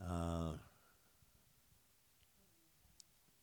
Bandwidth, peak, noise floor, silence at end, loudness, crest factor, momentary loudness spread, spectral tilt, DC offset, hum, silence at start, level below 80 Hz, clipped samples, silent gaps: over 20 kHz; -28 dBFS; -73 dBFS; 2.75 s; -45 LUFS; 22 dB; 23 LU; -7 dB/octave; under 0.1%; none; 0 s; -64 dBFS; under 0.1%; none